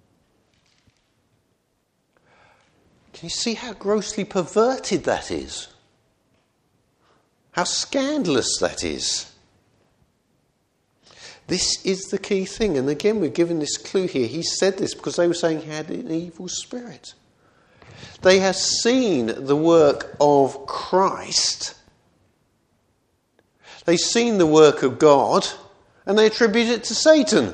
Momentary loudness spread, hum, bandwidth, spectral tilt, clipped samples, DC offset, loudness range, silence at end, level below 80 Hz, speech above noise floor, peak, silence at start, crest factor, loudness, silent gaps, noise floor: 14 LU; none; 10.5 kHz; -3.5 dB/octave; under 0.1%; under 0.1%; 10 LU; 0 s; -54 dBFS; 49 dB; 0 dBFS; 3.15 s; 22 dB; -20 LUFS; none; -69 dBFS